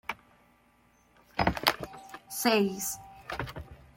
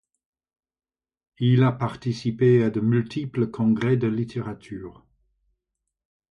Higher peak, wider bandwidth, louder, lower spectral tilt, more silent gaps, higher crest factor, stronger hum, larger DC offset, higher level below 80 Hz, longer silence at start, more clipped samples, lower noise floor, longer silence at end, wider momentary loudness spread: about the same, -6 dBFS vs -8 dBFS; first, 16.5 kHz vs 7 kHz; second, -31 LUFS vs -23 LUFS; second, -3.5 dB/octave vs -8.5 dB/octave; neither; first, 28 dB vs 16 dB; neither; neither; first, -52 dBFS vs -58 dBFS; second, 0.1 s vs 1.4 s; neither; second, -65 dBFS vs -83 dBFS; second, 0.2 s vs 1.4 s; about the same, 18 LU vs 16 LU